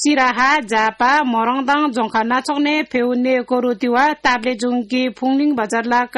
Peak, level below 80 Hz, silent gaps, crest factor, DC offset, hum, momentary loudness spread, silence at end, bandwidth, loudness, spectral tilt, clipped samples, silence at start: -4 dBFS; -54 dBFS; none; 14 dB; under 0.1%; none; 4 LU; 0 s; 12 kHz; -17 LUFS; -3 dB/octave; under 0.1%; 0 s